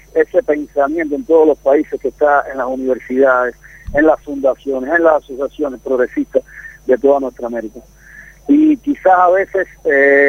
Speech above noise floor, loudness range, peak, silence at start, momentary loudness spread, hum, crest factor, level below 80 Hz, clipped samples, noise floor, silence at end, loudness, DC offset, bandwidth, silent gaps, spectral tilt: 26 dB; 2 LU; 0 dBFS; 0.15 s; 11 LU; none; 14 dB; -42 dBFS; under 0.1%; -39 dBFS; 0 s; -15 LUFS; under 0.1%; 15.5 kHz; none; -6.5 dB/octave